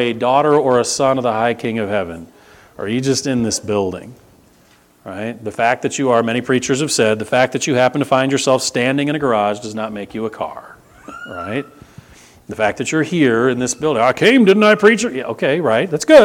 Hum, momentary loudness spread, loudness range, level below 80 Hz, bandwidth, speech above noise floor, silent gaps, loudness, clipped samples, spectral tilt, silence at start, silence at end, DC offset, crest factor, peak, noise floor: none; 15 LU; 8 LU; -54 dBFS; 17.5 kHz; 36 dB; none; -16 LUFS; under 0.1%; -4.5 dB/octave; 0 s; 0 s; under 0.1%; 16 dB; 0 dBFS; -51 dBFS